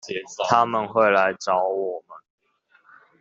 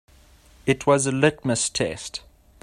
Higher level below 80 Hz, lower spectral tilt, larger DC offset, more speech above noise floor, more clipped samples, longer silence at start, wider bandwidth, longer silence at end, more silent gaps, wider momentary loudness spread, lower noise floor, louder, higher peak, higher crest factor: second, -70 dBFS vs -52 dBFS; about the same, -4 dB/octave vs -4 dB/octave; neither; first, 39 dB vs 30 dB; neither; second, 0.05 s vs 0.65 s; second, 8 kHz vs 14 kHz; first, 1 s vs 0.45 s; neither; about the same, 12 LU vs 14 LU; first, -61 dBFS vs -53 dBFS; about the same, -21 LUFS vs -22 LUFS; about the same, -2 dBFS vs -4 dBFS; about the same, 20 dB vs 22 dB